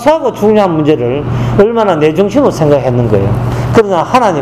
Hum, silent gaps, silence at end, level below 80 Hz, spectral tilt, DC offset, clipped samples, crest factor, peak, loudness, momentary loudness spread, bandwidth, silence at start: none; none; 0 s; -32 dBFS; -7.5 dB/octave; under 0.1%; 0.9%; 10 dB; 0 dBFS; -10 LUFS; 4 LU; 14 kHz; 0 s